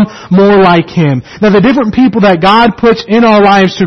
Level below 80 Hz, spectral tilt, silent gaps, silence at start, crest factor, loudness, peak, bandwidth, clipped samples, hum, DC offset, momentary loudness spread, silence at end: -38 dBFS; -7 dB/octave; none; 0 s; 6 dB; -7 LUFS; 0 dBFS; 6.4 kHz; 0.3%; none; 0.4%; 6 LU; 0 s